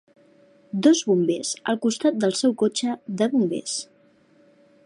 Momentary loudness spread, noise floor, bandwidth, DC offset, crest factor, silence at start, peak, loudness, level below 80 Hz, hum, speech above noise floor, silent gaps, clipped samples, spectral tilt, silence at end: 10 LU; -58 dBFS; 11.5 kHz; under 0.1%; 18 dB; 0.75 s; -6 dBFS; -23 LUFS; -74 dBFS; none; 36 dB; none; under 0.1%; -4.5 dB/octave; 1 s